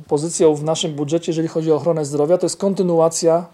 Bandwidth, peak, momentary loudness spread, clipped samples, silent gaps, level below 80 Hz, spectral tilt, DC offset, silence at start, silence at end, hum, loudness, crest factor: 13 kHz; -2 dBFS; 5 LU; under 0.1%; none; -64 dBFS; -5.5 dB/octave; under 0.1%; 0 s; 0.05 s; none; -18 LUFS; 14 dB